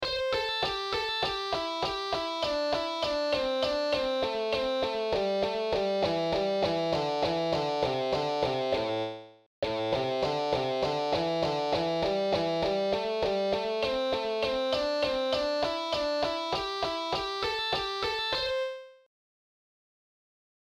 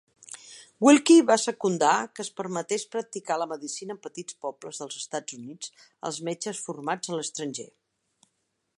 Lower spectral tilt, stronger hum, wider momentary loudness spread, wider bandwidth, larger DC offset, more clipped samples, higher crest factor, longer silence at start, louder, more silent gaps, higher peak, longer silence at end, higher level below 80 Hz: about the same, -4.5 dB/octave vs -3.5 dB/octave; neither; second, 3 LU vs 21 LU; first, 15 kHz vs 11.5 kHz; neither; neither; second, 14 dB vs 22 dB; second, 0 s vs 0.35 s; second, -29 LUFS vs -26 LUFS; first, 9.46-9.62 s vs none; second, -16 dBFS vs -6 dBFS; first, 1.7 s vs 1.1 s; first, -56 dBFS vs -82 dBFS